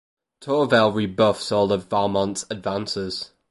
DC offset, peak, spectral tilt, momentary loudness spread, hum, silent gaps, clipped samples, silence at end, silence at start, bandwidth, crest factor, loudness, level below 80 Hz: under 0.1%; -4 dBFS; -5 dB/octave; 10 LU; none; none; under 0.1%; 0.25 s; 0.4 s; 11.5 kHz; 18 dB; -22 LUFS; -54 dBFS